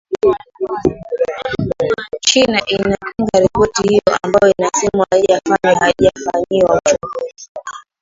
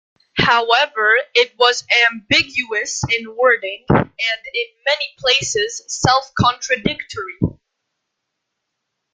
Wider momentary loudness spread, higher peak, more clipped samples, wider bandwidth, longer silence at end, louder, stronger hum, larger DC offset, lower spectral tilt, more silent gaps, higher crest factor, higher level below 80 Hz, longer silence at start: about the same, 10 LU vs 9 LU; about the same, 0 dBFS vs 0 dBFS; neither; second, 7.8 kHz vs 9.6 kHz; second, 0.2 s vs 1.6 s; about the same, -15 LUFS vs -17 LUFS; neither; neither; about the same, -3.5 dB/octave vs -3 dB/octave; first, 7.49-7.55 s vs none; about the same, 14 dB vs 18 dB; about the same, -42 dBFS vs -46 dBFS; second, 0.1 s vs 0.35 s